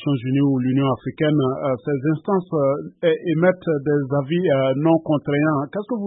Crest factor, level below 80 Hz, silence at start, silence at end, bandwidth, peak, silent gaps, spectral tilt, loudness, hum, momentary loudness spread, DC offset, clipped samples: 16 dB; -60 dBFS; 0 s; 0 s; 3.9 kHz; -4 dBFS; none; -12.5 dB/octave; -20 LUFS; none; 4 LU; under 0.1%; under 0.1%